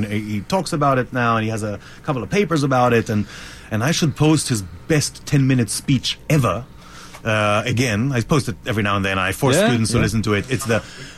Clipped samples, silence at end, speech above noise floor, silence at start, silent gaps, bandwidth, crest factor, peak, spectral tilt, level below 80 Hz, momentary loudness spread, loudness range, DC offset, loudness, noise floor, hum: under 0.1%; 0 s; 20 dB; 0 s; none; 15.5 kHz; 14 dB; -6 dBFS; -5 dB/octave; -42 dBFS; 9 LU; 1 LU; under 0.1%; -19 LUFS; -39 dBFS; none